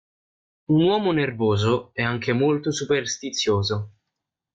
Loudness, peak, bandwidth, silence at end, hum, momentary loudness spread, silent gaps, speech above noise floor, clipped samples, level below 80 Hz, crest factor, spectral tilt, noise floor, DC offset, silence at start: -23 LUFS; -10 dBFS; 9.2 kHz; 0.65 s; none; 7 LU; none; 61 dB; under 0.1%; -58 dBFS; 14 dB; -5 dB/octave; -83 dBFS; under 0.1%; 0.7 s